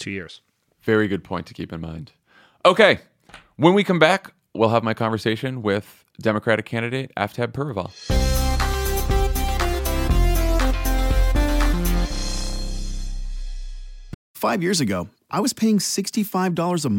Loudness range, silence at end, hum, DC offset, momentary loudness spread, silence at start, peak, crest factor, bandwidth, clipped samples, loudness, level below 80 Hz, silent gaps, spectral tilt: 7 LU; 0 s; none; under 0.1%; 16 LU; 0 s; 0 dBFS; 20 dB; 17 kHz; under 0.1%; -22 LUFS; -26 dBFS; 14.14-14.34 s; -5 dB/octave